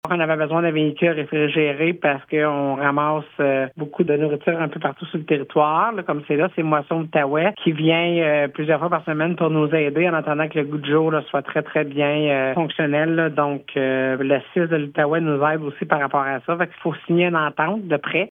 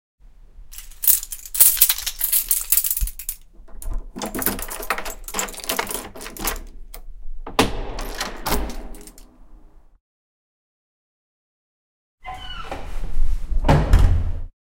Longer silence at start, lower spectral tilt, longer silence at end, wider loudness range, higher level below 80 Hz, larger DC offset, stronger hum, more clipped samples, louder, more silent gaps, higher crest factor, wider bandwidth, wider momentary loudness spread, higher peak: second, 0.05 s vs 0.55 s; first, -9 dB/octave vs -3 dB/octave; second, 0 s vs 0.15 s; second, 2 LU vs 18 LU; second, -72 dBFS vs -26 dBFS; neither; neither; neither; about the same, -20 LUFS vs -20 LUFS; second, none vs 10.00-12.18 s; about the same, 20 dB vs 22 dB; second, 3.8 kHz vs 17.5 kHz; second, 5 LU vs 22 LU; about the same, 0 dBFS vs 0 dBFS